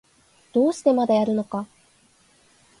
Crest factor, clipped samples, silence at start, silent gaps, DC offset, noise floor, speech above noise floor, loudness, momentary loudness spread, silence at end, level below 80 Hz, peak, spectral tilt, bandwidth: 18 dB; under 0.1%; 0.55 s; none; under 0.1%; -59 dBFS; 38 dB; -22 LUFS; 12 LU; 1.15 s; -68 dBFS; -6 dBFS; -6.5 dB/octave; 11.5 kHz